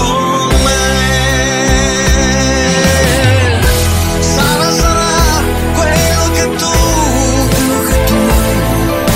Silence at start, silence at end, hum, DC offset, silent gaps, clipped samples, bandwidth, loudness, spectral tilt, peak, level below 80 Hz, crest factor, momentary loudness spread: 0 s; 0 s; none; under 0.1%; none; under 0.1%; 16.5 kHz; -11 LUFS; -4 dB/octave; 0 dBFS; -16 dBFS; 10 dB; 3 LU